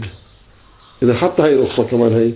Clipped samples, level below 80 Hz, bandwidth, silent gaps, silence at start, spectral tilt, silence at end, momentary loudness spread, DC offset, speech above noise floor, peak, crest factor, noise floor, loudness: under 0.1%; -44 dBFS; 4 kHz; none; 0 s; -11.5 dB/octave; 0 s; 5 LU; under 0.1%; 33 dB; 0 dBFS; 16 dB; -47 dBFS; -15 LUFS